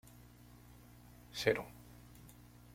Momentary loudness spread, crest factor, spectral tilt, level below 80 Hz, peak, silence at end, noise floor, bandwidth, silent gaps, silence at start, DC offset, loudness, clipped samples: 24 LU; 28 dB; -4 dB/octave; -64 dBFS; -16 dBFS; 0.35 s; -59 dBFS; 16.5 kHz; none; 0.55 s; under 0.1%; -37 LUFS; under 0.1%